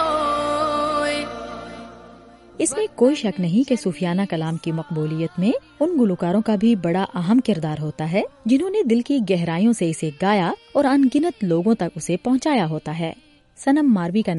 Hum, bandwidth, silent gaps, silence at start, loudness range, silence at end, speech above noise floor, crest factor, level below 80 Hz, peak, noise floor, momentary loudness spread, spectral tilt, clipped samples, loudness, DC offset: none; 11.5 kHz; none; 0 s; 3 LU; 0 s; 26 dB; 16 dB; -54 dBFS; -6 dBFS; -45 dBFS; 8 LU; -6 dB/octave; under 0.1%; -21 LUFS; under 0.1%